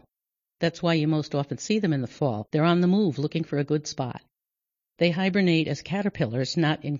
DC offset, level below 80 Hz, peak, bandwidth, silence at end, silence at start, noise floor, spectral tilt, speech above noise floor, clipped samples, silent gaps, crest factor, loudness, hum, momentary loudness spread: under 0.1%; -62 dBFS; -8 dBFS; 7.6 kHz; 0 s; 0.6 s; -88 dBFS; -6.5 dB/octave; 64 dB; under 0.1%; none; 16 dB; -25 LUFS; none; 8 LU